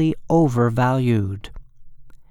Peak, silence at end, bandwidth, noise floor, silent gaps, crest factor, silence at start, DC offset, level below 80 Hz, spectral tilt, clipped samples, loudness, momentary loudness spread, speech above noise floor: -6 dBFS; 0.1 s; 12 kHz; -39 dBFS; none; 14 dB; 0 s; under 0.1%; -44 dBFS; -8.5 dB/octave; under 0.1%; -19 LUFS; 9 LU; 20 dB